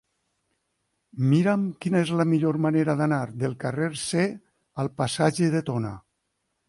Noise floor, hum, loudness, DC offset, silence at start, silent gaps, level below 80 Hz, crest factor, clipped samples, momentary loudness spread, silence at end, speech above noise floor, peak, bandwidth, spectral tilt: -77 dBFS; none; -25 LUFS; under 0.1%; 1.15 s; none; -62 dBFS; 16 dB; under 0.1%; 10 LU; 0.7 s; 53 dB; -8 dBFS; 11.5 kHz; -6.5 dB/octave